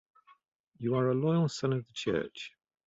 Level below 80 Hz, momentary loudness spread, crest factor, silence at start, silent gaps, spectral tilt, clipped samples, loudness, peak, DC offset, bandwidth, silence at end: -66 dBFS; 14 LU; 16 dB; 0.8 s; none; -6.5 dB/octave; under 0.1%; -31 LUFS; -16 dBFS; under 0.1%; 8 kHz; 0.4 s